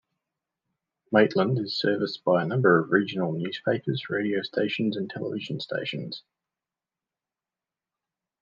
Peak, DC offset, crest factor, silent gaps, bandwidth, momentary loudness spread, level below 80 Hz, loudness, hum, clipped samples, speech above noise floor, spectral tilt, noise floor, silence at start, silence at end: -4 dBFS; under 0.1%; 24 dB; none; 7.4 kHz; 11 LU; -76 dBFS; -26 LUFS; none; under 0.1%; over 64 dB; -7.5 dB/octave; under -90 dBFS; 1.1 s; 2.2 s